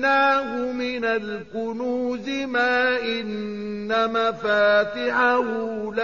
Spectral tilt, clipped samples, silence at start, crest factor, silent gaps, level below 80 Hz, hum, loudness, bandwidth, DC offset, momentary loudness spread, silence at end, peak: -1.5 dB/octave; under 0.1%; 0 s; 14 dB; none; -60 dBFS; none; -23 LUFS; 7.2 kHz; 0.2%; 11 LU; 0 s; -8 dBFS